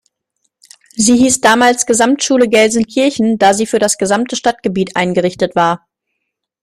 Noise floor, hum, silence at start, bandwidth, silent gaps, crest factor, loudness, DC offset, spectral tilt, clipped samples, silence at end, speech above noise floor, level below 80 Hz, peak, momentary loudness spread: -74 dBFS; none; 0.95 s; 15.5 kHz; none; 14 dB; -12 LUFS; under 0.1%; -3.5 dB/octave; under 0.1%; 0.85 s; 62 dB; -50 dBFS; 0 dBFS; 6 LU